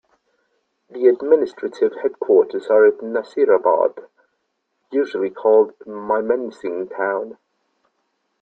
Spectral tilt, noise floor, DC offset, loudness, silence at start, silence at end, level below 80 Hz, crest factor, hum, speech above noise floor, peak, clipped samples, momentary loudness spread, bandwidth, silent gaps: -6.5 dB/octave; -72 dBFS; under 0.1%; -19 LUFS; 0.95 s; 1.1 s; -68 dBFS; 18 dB; none; 54 dB; -2 dBFS; under 0.1%; 12 LU; 6.4 kHz; none